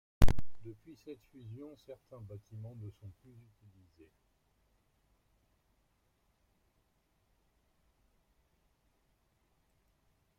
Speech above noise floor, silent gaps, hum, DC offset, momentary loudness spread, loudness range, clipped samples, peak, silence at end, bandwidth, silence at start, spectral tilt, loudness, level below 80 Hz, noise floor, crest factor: 25 dB; none; none; under 0.1%; 27 LU; 23 LU; under 0.1%; -10 dBFS; 7.5 s; 14.5 kHz; 0.2 s; -6.5 dB/octave; -43 LUFS; -46 dBFS; -76 dBFS; 26 dB